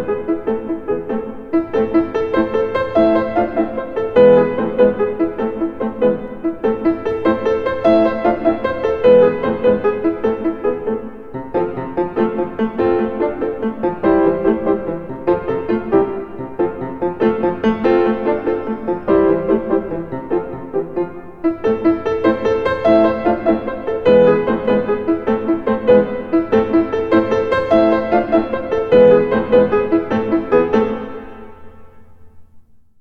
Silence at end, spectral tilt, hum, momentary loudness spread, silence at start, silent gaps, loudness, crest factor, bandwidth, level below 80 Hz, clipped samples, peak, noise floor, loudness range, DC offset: 0.05 s; -8.5 dB/octave; none; 9 LU; 0 s; none; -16 LUFS; 16 dB; 6.2 kHz; -42 dBFS; under 0.1%; -2 dBFS; -46 dBFS; 5 LU; 1%